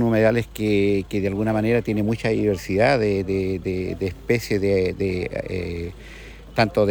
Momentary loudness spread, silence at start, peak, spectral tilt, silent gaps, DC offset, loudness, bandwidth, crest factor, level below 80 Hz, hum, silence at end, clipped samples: 9 LU; 0 s; -4 dBFS; -7 dB/octave; none; under 0.1%; -22 LUFS; over 20 kHz; 18 dB; -42 dBFS; none; 0 s; under 0.1%